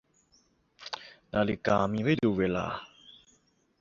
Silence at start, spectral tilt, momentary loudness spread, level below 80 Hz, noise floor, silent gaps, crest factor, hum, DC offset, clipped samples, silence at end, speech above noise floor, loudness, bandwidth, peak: 0.8 s; -7 dB/octave; 15 LU; -56 dBFS; -68 dBFS; none; 22 dB; none; under 0.1%; under 0.1%; 0.7 s; 41 dB; -29 LUFS; 7.6 kHz; -10 dBFS